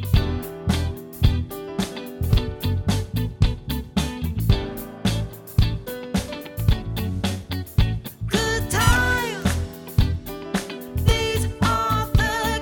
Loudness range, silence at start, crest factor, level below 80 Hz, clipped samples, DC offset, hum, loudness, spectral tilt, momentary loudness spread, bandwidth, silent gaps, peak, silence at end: 3 LU; 0 s; 18 dB; -28 dBFS; under 0.1%; under 0.1%; none; -24 LUFS; -5 dB/octave; 8 LU; 20 kHz; none; -4 dBFS; 0 s